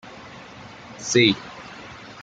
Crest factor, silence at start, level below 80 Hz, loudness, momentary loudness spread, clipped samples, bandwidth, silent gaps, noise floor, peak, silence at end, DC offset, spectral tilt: 22 dB; 0.05 s; -62 dBFS; -20 LUFS; 23 LU; under 0.1%; 9.2 kHz; none; -42 dBFS; -4 dBFS; 0 s; under 0.1%; -3.5 dB/octave